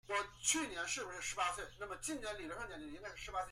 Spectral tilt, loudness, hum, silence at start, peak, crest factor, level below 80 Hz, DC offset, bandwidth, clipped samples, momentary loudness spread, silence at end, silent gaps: -1 dB/octave; -41 LUFS; none; 0.05 s; -20 dBFS; 22 dB; -62 dBFS; under 0.1%; 16 kHz; under 0.1%; 12 LU; 0 s; none